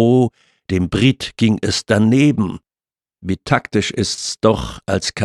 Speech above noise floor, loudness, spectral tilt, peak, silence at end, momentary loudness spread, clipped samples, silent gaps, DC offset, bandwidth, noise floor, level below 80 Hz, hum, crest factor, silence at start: over 74 dB; -17 LUFS; -5.5 dB/octave; -2 dBFS; 0 s; 9 LU; under 0.1%; none; under 0.1%; 12.5 kHz; under -90 dBFS; -42 dBFS; none; 16 dB; 0 s